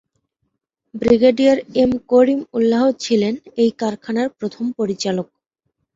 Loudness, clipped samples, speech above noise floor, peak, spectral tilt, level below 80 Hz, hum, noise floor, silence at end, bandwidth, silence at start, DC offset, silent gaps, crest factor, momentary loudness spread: -18 LUFS; under 0.1%; 57 dB; -2 dBFS; -5.5 dB/octave; -52 dBFS; none; -74 dBFS; 0.7 s; 7.8 kHz; 0.95 s; under 0.1%; none; 16 dB; 11 LU